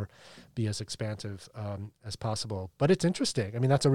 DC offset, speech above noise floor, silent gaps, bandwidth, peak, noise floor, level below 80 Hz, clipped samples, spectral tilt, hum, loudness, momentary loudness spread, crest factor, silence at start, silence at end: under 0.1%; 24 dB; none; 14.5 kHz; -12 dBFS; -54 dBFS; -62 dBFS; under 0.1%; -5.5 dB/octave; none; -31 LUFS; 15 LU; 18 dB; 0 s; 0 s